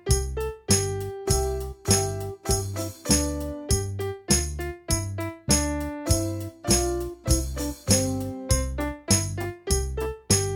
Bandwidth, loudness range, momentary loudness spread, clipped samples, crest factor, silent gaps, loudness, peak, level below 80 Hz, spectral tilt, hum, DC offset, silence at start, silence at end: 18 kHz; 1 LU; 9 LU; under 0.1%; 20 dB; none; -26 LUFS; -6 dBFS; -32 dBFS; -4 dB/octave; none; under 0.1%; 0.05 s; 0 s